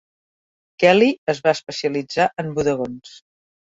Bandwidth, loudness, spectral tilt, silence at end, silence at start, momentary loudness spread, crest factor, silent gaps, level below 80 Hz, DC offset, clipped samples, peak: 8 kHz; -19 LUFS; -5 dB/octave; 0.55 s; 0.8 s; 11 LU; 20 dB; 1.18-1.27 s; -58 dBFS; under 0.1%; under 0.1%; -2 dBFS